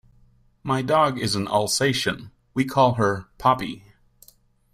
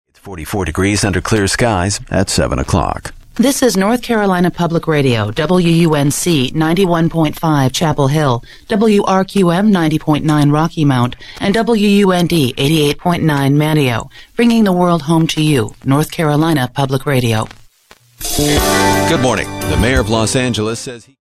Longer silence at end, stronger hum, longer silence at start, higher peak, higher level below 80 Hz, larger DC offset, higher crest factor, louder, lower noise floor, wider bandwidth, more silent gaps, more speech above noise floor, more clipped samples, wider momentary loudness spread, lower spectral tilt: first, 0.95 s vs 0.25 s; neither; first, 0.65 s vs 0.25 s; second, -4 dBFS vs 0 dBFS; second, -54 dBFS vs -32 dBFS; neither; first, 20 dB vs 12 dB; second, -22 LUFS vs -14 LUFS; first, -57 dBFS vs -47 dBFS; about the same, 16 kHz vs 15 kHz; neither; about the same, 35 dB vs 34 dB; neither; first, 13 LU vs 7 LU; about the same, -4.5 dB/octave vs -5.5 dB/octave